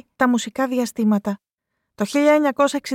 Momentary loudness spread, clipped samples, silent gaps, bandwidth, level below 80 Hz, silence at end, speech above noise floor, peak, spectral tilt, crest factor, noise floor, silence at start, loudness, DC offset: 11 LU; under 0.1%; 1.53-1.58 s; 17 kHz; -66 dBFS; 0 s; 59 dB; -4 dBFS; -5 dB/octave; 16 dB; -78 dBFS; 0.2 s; -20 LUFS; under 0.1%